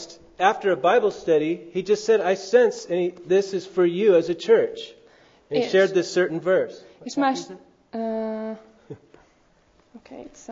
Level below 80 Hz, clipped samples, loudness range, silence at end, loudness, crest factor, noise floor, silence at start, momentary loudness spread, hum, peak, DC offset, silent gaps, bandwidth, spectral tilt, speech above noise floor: -66 dBFS; under 0.1%; 9 LU; 0 s; -22 LUFS; 18 dB; -60 dBFS; 0 s; 18 LU; none; -4 dBFS; under 0.1%; none; 7.8 kHz; -5 dB/octave; 38 dB